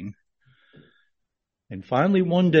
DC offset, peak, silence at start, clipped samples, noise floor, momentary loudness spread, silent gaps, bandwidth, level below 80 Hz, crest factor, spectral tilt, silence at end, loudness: under 0.1%; -6 dBFS; 0 s; under 0.1%; -81 dBFS; 21 LU; none; 6.4 kHz; -66 dBFS; 20 dB; -6 dB/octave; 0 s; -21 LUFS